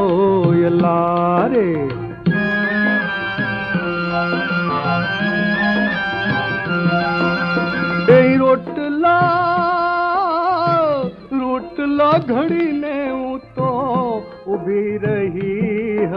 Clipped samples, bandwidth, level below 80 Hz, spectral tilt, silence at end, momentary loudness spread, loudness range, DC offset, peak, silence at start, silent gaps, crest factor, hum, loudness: under 0.1%; 6 kHz; -48 dBFS; -8.5 dB/octave; 0 s; 7 LU; 4 LU; under 0.1%; 0 dBFS; 0 s; none; 16 dB; none; -17 LUFS